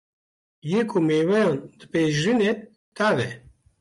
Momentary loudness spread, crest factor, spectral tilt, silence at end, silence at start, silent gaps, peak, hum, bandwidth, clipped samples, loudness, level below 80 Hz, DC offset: 11 LU; 12 dB; -6 dB/octave; 0.4 s; 0.65 s; 2.76-2.92 s; -10 dBFS; none; 11.5 kHz; under 0.1%; -23 LUFS; -62 dBFS; under 0.1%